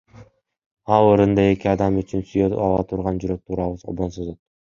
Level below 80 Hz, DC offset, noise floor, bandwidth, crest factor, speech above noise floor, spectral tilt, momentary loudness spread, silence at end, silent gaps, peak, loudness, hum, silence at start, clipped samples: -42 dBFS; under 0.1%; -48 dBFS; 7.4 kHz; 20 dB; 29 dB; -8.5 dB/octave; 12 LU; 0.35 s; 0.66-0.77 s; -2 dBFS; -20 LUFS; none; 0.15 s; under 0.1%